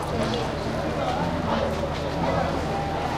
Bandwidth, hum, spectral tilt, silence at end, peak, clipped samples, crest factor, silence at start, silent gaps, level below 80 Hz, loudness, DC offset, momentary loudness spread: 15.5 kHz; none; -6 dB/octave; 0 s; -12 dBFS; under 0.1%; 14 dB; 0 s; none; -38 dBFS; -26 LUFS; under 0.1%; 3 LU